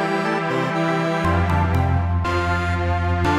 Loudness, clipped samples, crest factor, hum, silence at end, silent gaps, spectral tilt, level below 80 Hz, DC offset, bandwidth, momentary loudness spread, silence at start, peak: -21 LUFS; under 0.1%; 12 dB; none; 0 s; none; -7 dB/octave; -32 dBFS; under 0.1%; 10.5 kHz; 2 LU; 0 s; -6 dBFS